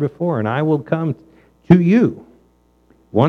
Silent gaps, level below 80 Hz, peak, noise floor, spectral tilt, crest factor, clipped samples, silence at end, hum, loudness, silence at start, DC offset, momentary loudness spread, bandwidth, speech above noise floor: none; -50 dBFS; 0 dBFS; -56 dBFS; -9.5 dB/octave; 16 dB; under 0.1%; 0 s; 60 Hz at -35 dBFS; -17 LUFS; 0 s; under 0.1%; 13 LU; 6.2 kHz; 40 dB